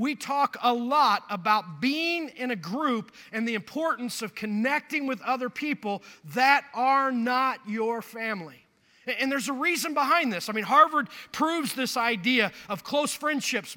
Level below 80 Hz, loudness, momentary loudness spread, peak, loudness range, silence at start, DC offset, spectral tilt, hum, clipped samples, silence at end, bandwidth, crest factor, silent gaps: -76 dBFS; -26 LUFS; 10 LU; -6 dBFS; 5 LU; 0 s; under 0.1%; -3.5 dB/octave; none; under 0.1%; 0 s; 17.5 kHz; 20 dB; none